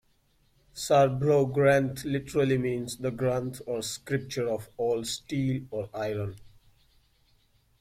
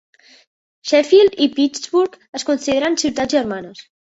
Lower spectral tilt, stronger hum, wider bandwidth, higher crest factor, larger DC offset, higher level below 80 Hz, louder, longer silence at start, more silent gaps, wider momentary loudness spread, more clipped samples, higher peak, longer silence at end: first, -5.5 dB/octave vs -3 dB/octave; neither; first, 16 kHz vs 8 kHz; about the same, 18 dB vs 16 dB; neither; about the same, -58 dBFS vs -56 dBFS; second, -28 LUFS vs -17 LUFS; about the same, 0.75 s vs 0.85 s; second, none vs 2.29-2.33 s; second, 11 LU vs 14 LU; neither; second, -10 dBFS vs -2 dBFS; first, 1.35 s vs 0.3 s